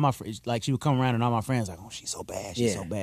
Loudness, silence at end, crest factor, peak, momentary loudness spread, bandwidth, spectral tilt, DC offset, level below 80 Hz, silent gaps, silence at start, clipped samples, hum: -28 LUFS; 0 s; 18 dB; -10 dBFS; 10 LU; 14.5 kHz; -5.5 dB/octave; under 0.1%; -56 dBFS; none; 0 s; under 0.1%; none